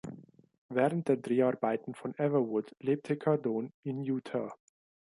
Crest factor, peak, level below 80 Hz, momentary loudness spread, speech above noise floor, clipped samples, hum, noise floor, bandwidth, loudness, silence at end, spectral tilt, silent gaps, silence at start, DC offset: 18 dB; -14 dBFS; -78 dBFS; 9 LU; 19 dB; under 0.1%; none; -51 dBFS; 11.5 kHz; -32 LUFS; 0.65 s; -8.5 dB/octave; 0.58-0.69 s, 3.74-3.83 s; 0.05 s; under 0.1%